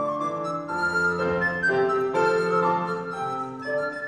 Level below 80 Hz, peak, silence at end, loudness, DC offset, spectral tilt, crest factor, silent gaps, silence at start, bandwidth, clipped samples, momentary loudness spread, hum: -58 dBFS; -10 dBFS; 0 s; -25 LUFS; under 0.1%; -6 dB/octave; 14 dB; none; 0 s; 11 kHz; under 0.1%; 7 LU; none